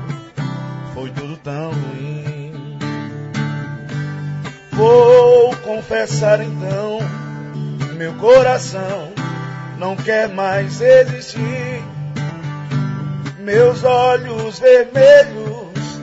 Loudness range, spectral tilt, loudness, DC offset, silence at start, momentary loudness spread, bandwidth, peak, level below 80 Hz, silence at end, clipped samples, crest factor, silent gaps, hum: 12 LU; -6 dB/octave; -15 LUFS; under 0.1%; 0 s; 17 LU; 8 kHz; -2 dBFS; -52 dBFS; 0 s; under 0.1%; 14 dB; none; none